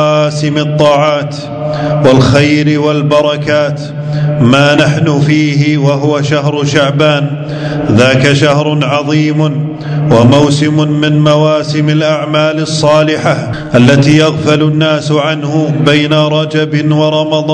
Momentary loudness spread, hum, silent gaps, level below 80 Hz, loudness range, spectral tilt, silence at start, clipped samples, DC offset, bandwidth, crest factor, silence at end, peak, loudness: 7 LU; none; none; -40 dBFS; 1 LU; -6 dB/octave; 0 s; 2%; under 0.1%; 9.4 kHz; 8 dB; 0 s; 0 dBFS; -9 LUFS